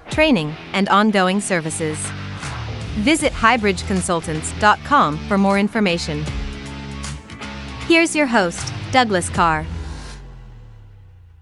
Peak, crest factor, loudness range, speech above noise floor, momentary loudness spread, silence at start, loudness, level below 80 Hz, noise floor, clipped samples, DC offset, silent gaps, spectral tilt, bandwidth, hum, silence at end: 0 dBFS; 20 dB; 3 LU; 26 dB; 16 LU; 0.05 s; -18 LUFS; -36 dBFS; -44 dBFS; under 0.1%; under 0.1%; none; -4.5 dB/octave; 12 kHz; none; 0.5 s